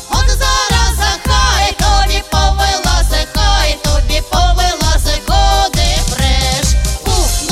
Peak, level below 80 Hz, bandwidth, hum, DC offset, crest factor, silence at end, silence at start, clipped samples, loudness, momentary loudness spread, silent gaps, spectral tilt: 0 dBFS; -14 dBFS; 16 kHz; none; under 0.1%; 10 dB; 0 s; 0 s; under 0.1%; -13 LUFS; 3 LU; none; -3 dB/octave